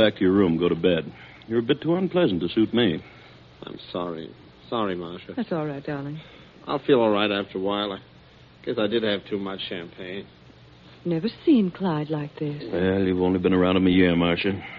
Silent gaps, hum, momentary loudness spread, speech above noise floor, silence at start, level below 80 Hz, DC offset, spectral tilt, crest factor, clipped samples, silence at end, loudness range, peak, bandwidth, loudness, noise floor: none; none; 16 LU; 27 dB; 0 s; -56 dBFS; under 0.1%; -5 dB/octave; 20 dB; under 0.1%; 0 s; 8 LU; -4 dBFS; 5.2 kHz; -24 LUFS; -51 dBFS